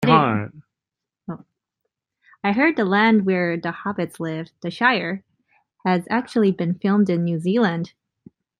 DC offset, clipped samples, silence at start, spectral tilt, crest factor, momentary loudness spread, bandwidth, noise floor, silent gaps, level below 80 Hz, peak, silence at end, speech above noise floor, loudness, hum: under 0.1%; under 0.1%; 0 s; -7.5 dB/octave; 20 dB; 17 LU; 11 kHz; -86 dBFS; none; -66 dBFS; -2 dBFS; 0.75 s; 66 dB; -21 LUFS; none